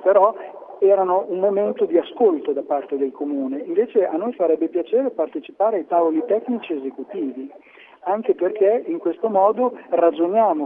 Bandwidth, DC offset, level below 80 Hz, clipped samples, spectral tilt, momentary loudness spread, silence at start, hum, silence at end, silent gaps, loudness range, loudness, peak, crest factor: 3.8 kHz; under 0.1%; -78 dBFS; under 0.1%; -9.5 dB/octave; 10 LU; 0 s; none; 0 s; none; 3 LU; -20 LUFS; -4 dBFS; 16 dB